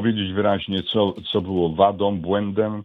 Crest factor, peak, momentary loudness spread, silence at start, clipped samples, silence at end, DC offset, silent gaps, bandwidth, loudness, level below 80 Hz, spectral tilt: 18 dB; -2 dBFS; 5 LU; 0 s; under 0.1%; 0 s; under 0.1%; none; 4.7 kHz; -21 LUFS; -52 dBFS; -9 dB/octave